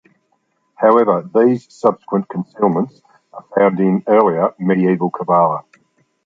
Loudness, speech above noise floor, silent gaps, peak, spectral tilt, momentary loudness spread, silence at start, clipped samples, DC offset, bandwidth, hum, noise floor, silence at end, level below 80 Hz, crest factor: -16 LUFS; 50 dB; none; -2 dBFS; -9.5 dB/octave; 9 LU; 0.8 s; under 0.1%; under 0.1%; 7.6 kHz; none; -65 dBFS; 0.65 s; -64 dBFS; 14 dB